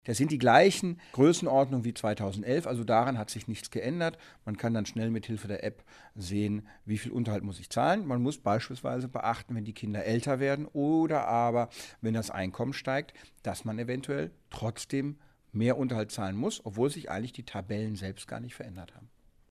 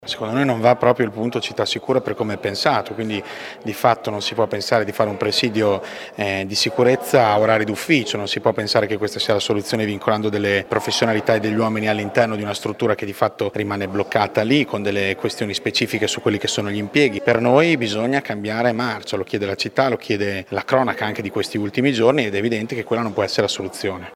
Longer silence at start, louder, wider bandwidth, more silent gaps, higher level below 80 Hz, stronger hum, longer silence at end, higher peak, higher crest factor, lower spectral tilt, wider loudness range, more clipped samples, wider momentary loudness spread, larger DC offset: about the same, 0.05 s vs 0 s; second, -31 LUFS vs -20 LUFS; second, 14.5 kHz vs 17 kHz; neither; about the same, -62 dBFS vs -60 dBFS; neither; first, 0.45 s vs 0 s; second, -6 dBFS vs 0 dBFS; about the same, 24 dB vs 20 dB; first, -6 dB/octave vs -4.5 dB/octave; first, 6 LU vs 3 LU; neither; first, 13 LU vs 7 LU; neither